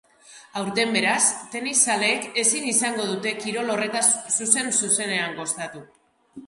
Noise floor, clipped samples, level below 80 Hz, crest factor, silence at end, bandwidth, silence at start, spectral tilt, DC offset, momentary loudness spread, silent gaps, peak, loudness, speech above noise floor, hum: -49 dBFS; under 0.1%; -70 dBFS; 24 dB; 0 s; 11.5 kHz; 0.3 s; -1 dB/octave; under 0.1%; 9 LU; none; 0 dBFS; -21 LUFS; 26 dB; none